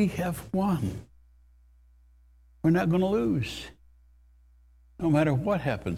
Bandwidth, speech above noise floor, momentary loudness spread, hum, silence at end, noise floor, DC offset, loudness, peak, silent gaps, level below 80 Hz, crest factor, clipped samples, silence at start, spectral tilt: 15.5 kHz; 32 dB; 11 LU; 60 Hz at -50 dBFS; 0 s; -58 dBFS; under 0.1%; -27 LUFS; -10 dBFS; none; -50 dBFS; 18 dB; under 0.1%; 0 s; -7.5 dB/octave